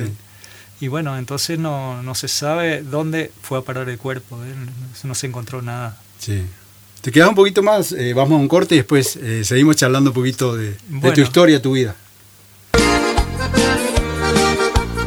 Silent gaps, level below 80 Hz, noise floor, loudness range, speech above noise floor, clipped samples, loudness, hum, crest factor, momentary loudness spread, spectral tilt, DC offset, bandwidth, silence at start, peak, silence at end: none; -32 dBFS; -46 dBFS; 11 LU; 29 dB; under 0.1%; -17 LUFS; none; 18 dB; 16 LU; -5 dB/octave; under 0.1%; over 20 kHz; 0 s; 0 dBFS; 0 s